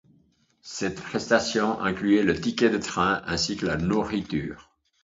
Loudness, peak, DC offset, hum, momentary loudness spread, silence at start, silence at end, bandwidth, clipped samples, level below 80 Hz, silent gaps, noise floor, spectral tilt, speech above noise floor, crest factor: -25 LUFS; -4 dBFS; under 0.1%; none; 9 LU; 0.65 s; 0.45 s; 8 kHz; under 0.1%; -50 dBFS; none; -64 dBFS; -4.5 dB/octave; 39 dB; 20 dB